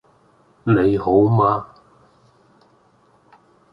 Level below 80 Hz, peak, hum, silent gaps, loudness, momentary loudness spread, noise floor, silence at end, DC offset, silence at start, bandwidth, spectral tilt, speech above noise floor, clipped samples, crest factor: -50 dBFS; -4 dBFS; none; none; -18 LUFS; 9 LU; -57 dBFS; 2.05 s; under 0.1%; 0.65 s; 5.2 kHz; -10.5 dB/octave; 41 dB; under 0.1%; 18 dB